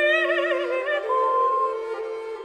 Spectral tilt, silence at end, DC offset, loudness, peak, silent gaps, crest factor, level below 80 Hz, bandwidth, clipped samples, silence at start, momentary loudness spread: -2 dB/octave; 0 s; under 0.1%; -23 LUFS; -10 dBFS; none; 14 dB; -70 dBFS; 10 kHz; under 0.1%; 0 s; 10 LU